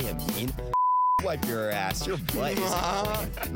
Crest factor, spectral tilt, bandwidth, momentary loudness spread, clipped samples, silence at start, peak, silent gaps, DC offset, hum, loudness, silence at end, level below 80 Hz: 16 dB; -4.5 dB/octave; 17 kHz; 6 LU; under 0.1%; 0 s; -12 dBFS; none; under 0.1%; none; -27 LUFS; 0 s; -40 dBFS